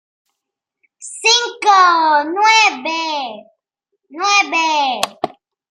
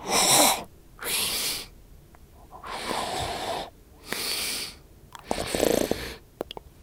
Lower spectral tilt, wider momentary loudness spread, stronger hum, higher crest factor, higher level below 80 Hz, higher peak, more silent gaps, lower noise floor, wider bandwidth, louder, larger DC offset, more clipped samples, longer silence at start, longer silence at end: second, 0.5 dB/octave vs -1.5 dB/octave; second, 17 LU vs 20 LU; neither; second, 16 dB vs 24 dB; second, -76 dBFS vs -50 dBFS; first, 0 dBFS vs -4 dBFS; neither; first, -80 dBFS vs -50 dBFS; second, 15 kHz vs 18 kHz; first, -13 LUFS vs -26 LUFS; neither; neither; first, 1 s vs 0 s; first, 0.45 s vs 0.15 s